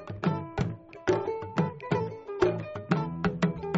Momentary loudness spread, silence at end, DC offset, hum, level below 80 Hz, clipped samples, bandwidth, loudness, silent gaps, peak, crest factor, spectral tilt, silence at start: 6 LU; 0 s; under 0.1%; none; -52 dBFS; under 0.1%; 7.6 kHz; -31 LUFS; none; -8 dBFS; 22 dB; -6.5 dB/octave; 0 s